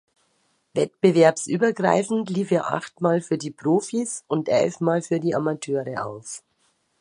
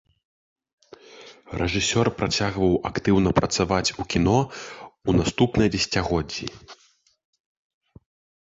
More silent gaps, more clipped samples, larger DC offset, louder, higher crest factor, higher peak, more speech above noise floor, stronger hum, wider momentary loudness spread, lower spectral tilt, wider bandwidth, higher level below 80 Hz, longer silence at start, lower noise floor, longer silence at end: neither; neither; neither; about the same, -23 LUFS vs -23 LUFS; about the same, 22 dB vs 20 dB; about the same, -2 dBFS vs -4 dBFS; first, 46 dB vs 25 dB; neither; about the same, 12 LU vs 11 LU; about the same, -5.5 dB/octave vs -5 dB/octave; first, 11.5 kHz vs 8.2 kHz; second, -68 dBFS vs -42 dBFS; second, 0.75 s vs 1.15 s; first, -68 dBFS vs -47 dBFS; second, 0.6 s vs 1.75 s